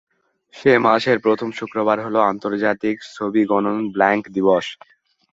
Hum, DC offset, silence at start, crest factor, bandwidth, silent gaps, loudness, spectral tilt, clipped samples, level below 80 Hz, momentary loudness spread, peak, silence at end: none; under 0.1%; 0.55 s; 18 dB; 7.8 kHz; none; -19 LUFS; -6 dB/octave; under 0.1%; -62 dBFS; 8 LU; -2 dBFS; 0.6 s